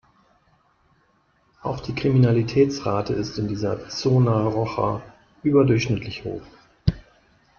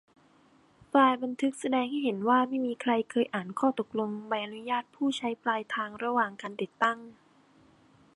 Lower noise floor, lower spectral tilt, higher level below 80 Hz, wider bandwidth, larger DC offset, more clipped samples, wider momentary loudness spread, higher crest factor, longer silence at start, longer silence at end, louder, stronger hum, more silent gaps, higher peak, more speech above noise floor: about the same, -63 dBFS vs -62 dBFS; first, -7.5 dB/octave vs -5 dB/octave; first, -46 dBFS vs -78 dBFS; second, 7 kHz vs 11.5 kHz; neither; neither; first, 14 LU vs 8 LU; about the same, 18 dB vs 20 dB; first, 1.65 s vs 0.95 s; second, 0.6 s vs 1.05 s; first, -23 LUFS vs -29 LUFS; neither; neither; first, -4 dBFS vs -10 dBFS; first, 42 dB vs 33 dB